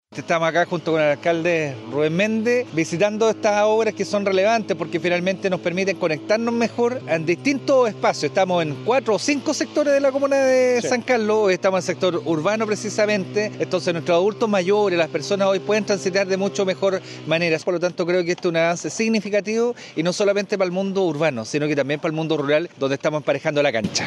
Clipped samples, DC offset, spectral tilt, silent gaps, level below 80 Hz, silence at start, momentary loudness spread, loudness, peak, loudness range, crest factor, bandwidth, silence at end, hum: under 0.1%; under 0.1%; -5 dB/octave; none; -72 dBFS; 0.1 s; 5 LU; -20 LUFS; -6 dBFS; 2 LU; 14 dB; 12 kHz; 0 s; none